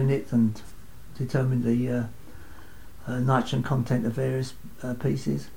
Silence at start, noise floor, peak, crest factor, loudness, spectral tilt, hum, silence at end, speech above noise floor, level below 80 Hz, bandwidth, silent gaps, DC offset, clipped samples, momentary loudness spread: 0 s; -47 dBFS; -10 dBFS; 18 dB; -27 LUFS; -7.5 dB/octave; none; 0 s; 21 dB; -50 dBFS; 16.5 kHz; none; 1%; under 0.1%; 15 LU